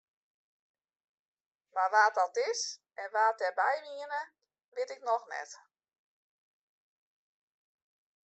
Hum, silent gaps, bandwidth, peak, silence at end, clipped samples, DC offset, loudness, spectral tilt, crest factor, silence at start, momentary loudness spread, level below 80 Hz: none; 4.64-4.72 s; 8.2 kHz; -12 dBFS; 2.65 s; under 0.1%; under 0.1%; -32 LUFS; 2.5 dB/octave; 24 dB; 1.75 s; 16 LU; under -90 dBFS